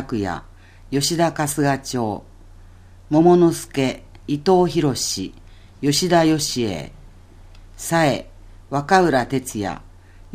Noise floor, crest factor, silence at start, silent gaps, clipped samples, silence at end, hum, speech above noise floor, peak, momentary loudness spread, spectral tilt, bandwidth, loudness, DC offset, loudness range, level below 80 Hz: -44 dBFS; 20 dB; 0 s; none; under 0.1%; 0 s; none; 25 dB; 0 dBFS; 13 LU; -5 dB/octave; 15.5 kHz; -19 LUFS; under 0.1%; 3 LU; -44 dBFS